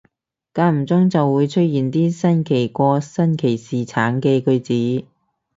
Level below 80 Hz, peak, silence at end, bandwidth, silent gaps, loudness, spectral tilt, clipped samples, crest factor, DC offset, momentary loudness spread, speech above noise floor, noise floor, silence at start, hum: -60 dBFS; -2 dBFS; 0.55 s; 7.8 kHz; none; -18 LUFS; -8 dB/octave; under 0.1%; 16 dB; under 0.1%; 5 LU; 47 dB; -64 dBFS; 0.55 s; none